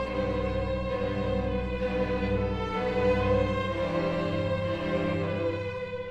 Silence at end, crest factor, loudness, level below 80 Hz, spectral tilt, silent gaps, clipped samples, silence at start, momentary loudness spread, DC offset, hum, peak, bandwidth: 0 s; 14 dB; -29 LUFS; -40 dBFS; -7.5 dB/octave; none; under 0.1%; 0 s; 4 LU; under 0.1%; none; -14 dBFS; 8.4 kHz